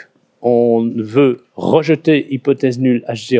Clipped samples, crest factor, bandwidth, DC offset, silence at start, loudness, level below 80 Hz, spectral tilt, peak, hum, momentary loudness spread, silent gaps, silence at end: under 0.1%; 14 dB; 8 kHz; under 0.1%; 0.4 s; -15 LUFS; -60 dBFS; -7.5 dB/octave; 0 dBFS; none; 5 LU; none; 0 s